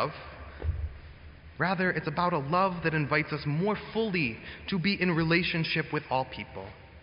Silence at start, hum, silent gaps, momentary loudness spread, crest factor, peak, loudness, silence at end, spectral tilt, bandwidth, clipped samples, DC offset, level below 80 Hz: 0 s; none; none; 16 LU; 20 dB; -10 dBFS; -29 LUFS; 0 s; -4.5 dB/octave; 5.6 kHz; under 0.1%; under 0.1%; -46 dBFS